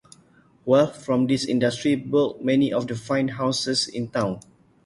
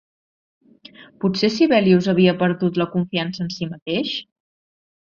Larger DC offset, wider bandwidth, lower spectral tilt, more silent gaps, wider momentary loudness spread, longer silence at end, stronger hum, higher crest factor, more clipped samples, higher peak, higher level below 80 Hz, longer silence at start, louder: neither; first, 11.5 kHz vs 7.2 kHz; second, -5 dB/octave vs -6.5 dB/octave; second, none vs 3.82-3.86 s; second, 7 LU vs 11 LU; second, 0.45 s vs 0.85 s; neither; about the same, 18 dB vs 18 dB; neither; second, -6 dBFS vs -2 dBFS; about the same, -60 dBFS vs -60 dBFS; second, 0.65 s vs 1 s; second, -23 LUFS vs -20 LUFS